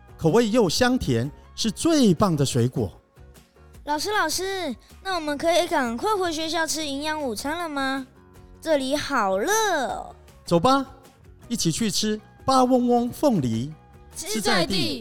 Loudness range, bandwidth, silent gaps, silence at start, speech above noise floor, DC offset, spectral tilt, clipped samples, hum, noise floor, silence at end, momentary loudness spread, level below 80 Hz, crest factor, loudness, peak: 3 LU; 18 kHz; none; 0 s; 27 dB; 0.5%; -4.5 dB/octave; under 0.1%; none; -50 dBFS; 0 s; 13 LU; -50 dBFS; 16 dB; -23 LUFS; -8 dBFS